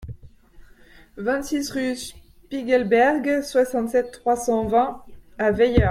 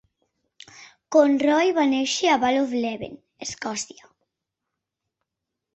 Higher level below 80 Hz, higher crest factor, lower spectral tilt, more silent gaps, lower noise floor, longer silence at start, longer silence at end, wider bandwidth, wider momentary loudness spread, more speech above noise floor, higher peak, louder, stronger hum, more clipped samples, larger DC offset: first, -38 dBFS vs -64 dBFS; about the same, 18 dB vs 20 dB; first, -5.5 dB/octave vs -3 dB/octave; neither; second, -49 dBFS vs -84 dBFS; second, 0 s vs 0.8 s; second, 0 s vs 1.9 s; first, 15.5 kHz vs 8.2 kHz; about the same, 14 LU vs 16 LU; second, 28 dB vs 62 dB; about the same, -4 dBFS vs -4 dBFS; about the same, -22 LUFS vs -21 LUFS; neither; neither; neither